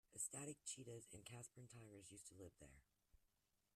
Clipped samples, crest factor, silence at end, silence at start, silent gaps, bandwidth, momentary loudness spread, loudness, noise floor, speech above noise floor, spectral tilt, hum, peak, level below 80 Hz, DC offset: under 0.1%; 24 dB; 0.55 s; 0.1 s; none; 14 kHz; 14 LU; -55 LUFS; -86 dBFS; 28 dB; -3 dB/octave; none; -36 dBFS; -80 dBFS; under 0.1%